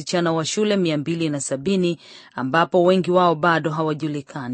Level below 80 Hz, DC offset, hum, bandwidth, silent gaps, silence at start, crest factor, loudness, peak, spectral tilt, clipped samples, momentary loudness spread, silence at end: -64 dBFS; under 0.1%; none; 8.8 kHz; none; 0 s; 18 dB; -20 LUFS; -4 dBFS; -5 dB/octave; under 0.1%; 11 LU; 0 s